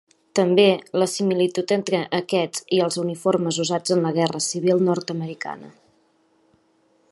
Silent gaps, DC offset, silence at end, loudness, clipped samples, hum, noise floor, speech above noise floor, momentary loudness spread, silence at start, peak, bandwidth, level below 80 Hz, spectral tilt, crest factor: none; under 0.1%; 1.4 s; -22 LUFS; under 0.1%; none; -62 dBFS; 41 dB; 10 LU; 0.35 s; -2 dBFS; 12 kHz; -72 dBFS; -4.5 dB/octave; 20 dB